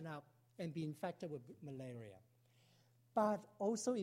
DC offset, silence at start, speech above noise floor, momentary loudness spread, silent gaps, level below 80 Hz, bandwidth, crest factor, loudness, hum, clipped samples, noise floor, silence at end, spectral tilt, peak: under 0.1%; 0 s; 30 dB; 15 LU; none; -84 dBFS; 16 kHz; 20 dB; -44 LUFS; none; under 0.1%; -73 dBFS; 0 s; -6 dB/octave; -24 dBFS